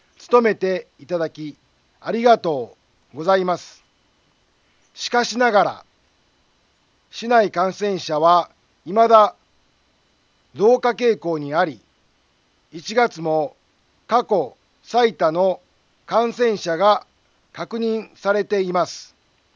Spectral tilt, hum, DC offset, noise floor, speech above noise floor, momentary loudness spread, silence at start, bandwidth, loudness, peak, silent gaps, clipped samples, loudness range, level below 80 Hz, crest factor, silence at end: -5 dB/octave; none; under 0.1%; -62 dBFS; 44 dB; 15 LU; 0.25 s; 7.4 kHz; -19 LUFS; 0 dBFS; none; under 0.1%; 5 LU; -70 dBFS; 20 dB; 0.5 s